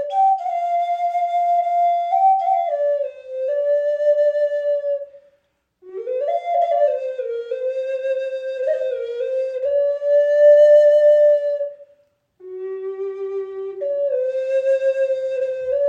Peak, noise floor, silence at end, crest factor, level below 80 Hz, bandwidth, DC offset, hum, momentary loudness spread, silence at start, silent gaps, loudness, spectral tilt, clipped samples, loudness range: -4 dBFS; -65 dBFS; 0 s; 14 dB; -72 dBFS; 7 kHz; under 0.1%; none; 14 LU; 0 s; none; -19 LUFS; -3.5 dB/octave; under 0.1%; 8 LU